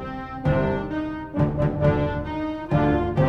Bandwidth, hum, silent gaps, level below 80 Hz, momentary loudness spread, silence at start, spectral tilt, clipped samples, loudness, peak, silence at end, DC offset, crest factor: 6 kHz; none; none; -36 dBFS; 8 LU; 0 s; -9.5 dB/octave; under 0.1%; -24 LUFS; -8 dBFS; 0 s; under 0.1%; 16 dB